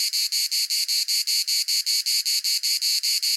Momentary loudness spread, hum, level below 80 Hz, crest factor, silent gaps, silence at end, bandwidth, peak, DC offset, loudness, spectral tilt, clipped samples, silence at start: 1 LU; none; under -90 dBFS; 14 dB; none; 0 s; 17 kHz; -10 dBFS; under 0.1%; -20 LUFS; 14.5 dB/octave; under 0.1%; 0 s